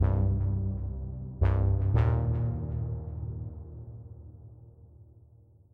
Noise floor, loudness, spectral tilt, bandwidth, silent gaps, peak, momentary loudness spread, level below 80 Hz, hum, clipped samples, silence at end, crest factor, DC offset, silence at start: -57 dBFS; -30 LUFS; -11 dB/octave; 3.6 kHz; none; -14 dBFS; 21 LU; -36 dBFS; none; under 0.1%; 0.7 s; 16 dB; under 0.1%; 0 s